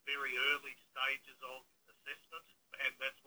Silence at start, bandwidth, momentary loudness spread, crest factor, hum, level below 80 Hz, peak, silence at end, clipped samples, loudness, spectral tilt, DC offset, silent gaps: 0.05 s; over 20 kHz; 19 LU; 20 dB; none; -88 dBFS; -22 dBFS; 0.15 s; under 0.1%; -38 LUFS; 0 dB/octave; under 0.1%; none